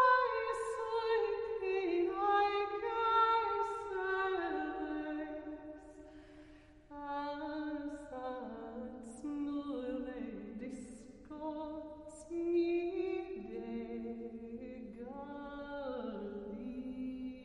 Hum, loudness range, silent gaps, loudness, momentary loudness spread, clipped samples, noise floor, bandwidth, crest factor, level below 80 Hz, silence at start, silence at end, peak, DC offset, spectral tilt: none; 11 LU; none; -38 LUFS; 16 LU; under 0.1%; -59 dBFS; 11 kHz; 18 dB; -64 dBFS; 0 s; 0 s; -20 dBFS; under 0.1%; -5 dB/octave